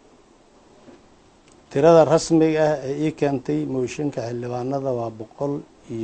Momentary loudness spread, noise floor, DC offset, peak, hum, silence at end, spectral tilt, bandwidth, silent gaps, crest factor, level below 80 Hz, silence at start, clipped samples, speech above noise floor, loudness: 14 LU; -53 dBFS; under 0.1%; -2 dBFS; none; 0 s; -6.5 dB/octave; 8.4 kHz; none; 20 dB; -56 dBFS; 1.7 s; under 0.1%; 33 dB; -21 LUFS